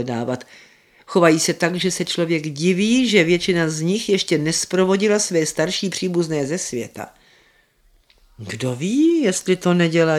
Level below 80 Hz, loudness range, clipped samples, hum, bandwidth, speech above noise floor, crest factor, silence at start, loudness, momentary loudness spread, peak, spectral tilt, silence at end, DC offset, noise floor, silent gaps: -56 dBFS; 6 LU; under 0.1%; none; 15.5 kHz; 39 dB; 18 dB; 0 s; -19 LUFS; 11 LU; 0 dBFS; -4.5 dB/octave; 0 s; under 0.1%; -58 dBFS; none